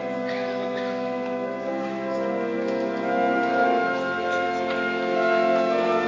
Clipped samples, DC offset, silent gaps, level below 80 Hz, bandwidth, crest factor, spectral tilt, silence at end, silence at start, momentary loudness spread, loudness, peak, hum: under 0.1%; under 0.1%; none; -64 dBFS; 7.6 kHz; 14 dB; -5.5 dB/octave; 0 s; 0 s; 7 LU; -25 LUFS; -10 dBFS; none